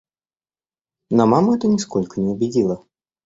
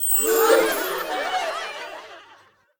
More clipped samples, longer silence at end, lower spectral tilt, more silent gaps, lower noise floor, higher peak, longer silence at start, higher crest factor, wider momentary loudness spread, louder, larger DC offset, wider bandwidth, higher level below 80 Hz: neither; about the same, 0.5 s vs 0.55 s; first, -7 dB/octave vs -0.5 dB/octave; neither; first, under -90 dBFS vs -54 dBFS; about the same, -2 dBFS vs -4 dBFS; first, 1.1 s vs 0 s; about the same, 18 dB vs 20 dB; second, 8 LU vs 18 LU; about the same, -19 LUFS vs -21 LUFS; neither; second, 8 kHz vs over 20 kHz; about the same, -56 dBFS vs -58 dBFS